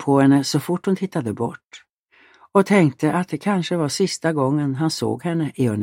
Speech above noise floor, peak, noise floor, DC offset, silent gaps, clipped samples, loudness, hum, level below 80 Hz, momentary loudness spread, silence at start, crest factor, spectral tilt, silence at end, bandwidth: 36 dB; -2 dBFS; -55 dBFS; under 0.1%; 1.65-1.69 s, 1.93-2.08 s; under 0.1%; -20 LUFS; none; -62 dBFS; 9 LU; 0 s; 18 dB; -6 dB/octave; 0 s; 16.5 kHz